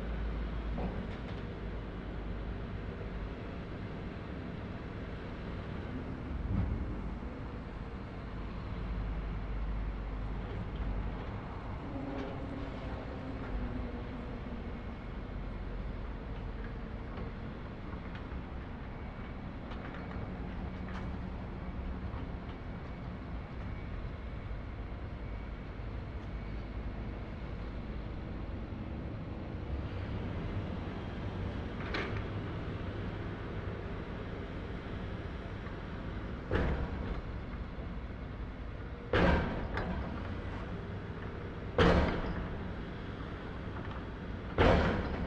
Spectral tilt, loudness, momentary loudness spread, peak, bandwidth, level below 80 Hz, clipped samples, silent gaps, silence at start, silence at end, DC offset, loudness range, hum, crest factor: -8 dB/octave; -39 LUFS; 8 LU; -12 dBFS; 7.6 kHz; -42 dBFS; under 0.1%; none; 0 s; 0 s; under 0.1%; 8 LU; none; 26 dB